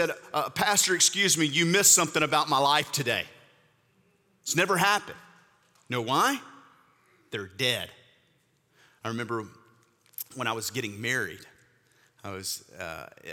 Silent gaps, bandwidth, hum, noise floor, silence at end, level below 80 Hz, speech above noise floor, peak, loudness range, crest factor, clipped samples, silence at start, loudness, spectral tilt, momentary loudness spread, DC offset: none; 19 kHz; none; -68 dBFS; 0 s; -70 dBFS; 41 dB; -8 dBFS; 12 LU; 22 dB; under 0.1%; 0 s; -25 LUFS; -2 dB/octave; 19 LU; under 0.1%